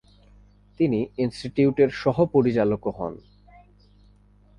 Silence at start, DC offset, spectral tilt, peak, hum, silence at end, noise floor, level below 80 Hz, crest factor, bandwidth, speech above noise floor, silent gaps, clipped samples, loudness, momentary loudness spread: 0.8 s; under 0.1%; -8 dB/octave; -6 dBFS; 50 Hz at -55 dBFS; 1.4 s; -55 dBFS; -52 dBFS; 18 dB; 10 kHz; 33 dB; none; under 0.1%; -23 LUFS; 9 LU